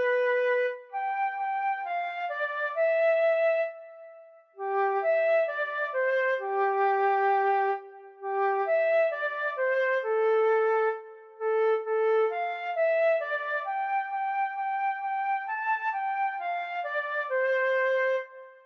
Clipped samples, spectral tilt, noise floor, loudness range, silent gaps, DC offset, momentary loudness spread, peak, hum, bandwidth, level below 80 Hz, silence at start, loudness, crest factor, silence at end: under 0.1%; -2 dB/octave; -51 dBFS; 3 LU; none; under 0.1%; 7 LU; -16 dBFS; none; 6.2 kHz; under -90 dBFS; 0 s; -27 LUFS; 12 dB; 0.15 s